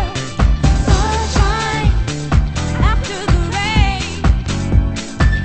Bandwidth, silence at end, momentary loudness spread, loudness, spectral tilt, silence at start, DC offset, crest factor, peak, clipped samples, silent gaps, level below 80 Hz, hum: 8.8 kHz; 0 s; 4 LU; -17 LUFS; -5.5 dB/octave; 0 s; under 0.1%; 14 dB; 0 dBFS; under 0.1%; none; -18 dBFS; none